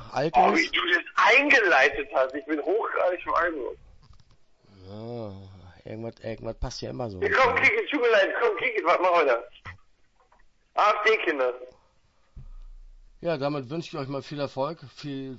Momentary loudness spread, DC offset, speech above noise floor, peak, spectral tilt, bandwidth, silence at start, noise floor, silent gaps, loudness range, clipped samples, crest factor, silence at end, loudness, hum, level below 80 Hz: 19 LU; under 0.1%; 38 dB; -8 dBFS; -4.5 dB/octave; 8 kHz; 0 s; -63 dBFS; none; 12 LU; under 0.1%; 18 dB; 0 s; -23 LUFS; none; -50 dBFS